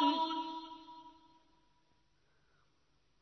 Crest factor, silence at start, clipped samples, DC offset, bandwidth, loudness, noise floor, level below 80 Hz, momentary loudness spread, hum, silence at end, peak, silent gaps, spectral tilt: 22 dB; 0 s; under 0.1%; under 0.1%; 6.2 kHz; -37 LUFS; -77 dBFS; -80 dBFS; 22 LU; none; 2.1 s; -20 dBFS; none; 0 dB/octave